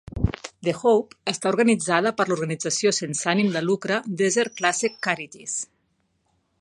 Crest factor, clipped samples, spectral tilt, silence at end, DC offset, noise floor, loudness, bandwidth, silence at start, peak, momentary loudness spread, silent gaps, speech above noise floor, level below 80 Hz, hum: 20 dB; under 0.1%; -4 dB/octave; 0.95 s; under 0.1%; -70 dBFS; -23 LUFS; 11.5 kHz; 0.15 s; -4 dBFS; 9 LU; none; 47 dB; -44 dBFS; none